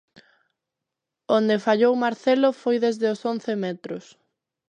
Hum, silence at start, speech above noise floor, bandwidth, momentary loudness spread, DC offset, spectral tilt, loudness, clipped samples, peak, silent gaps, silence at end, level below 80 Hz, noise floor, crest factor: none; 1.3 s; 63 dB; 9.6 kHz; 11 LU; under 0.1%; -6 dB/octave; -22 LUFS; under 0.1%; -6 dBFS; none; 0.7 s; -78 dBFS; -85 dBFS; 18 dB